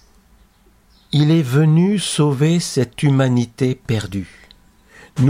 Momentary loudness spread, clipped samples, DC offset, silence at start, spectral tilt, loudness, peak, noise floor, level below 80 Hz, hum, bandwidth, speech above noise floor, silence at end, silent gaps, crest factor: 11 LU; under 0.1%; under 0.1%; 1.15 s; -6.5 dB/octave; -17 LUFS; -4 dBFS; -53 dBFS; -50 dBFS; none; 15 kHz; 37 dB; 0 s; none; 14 dB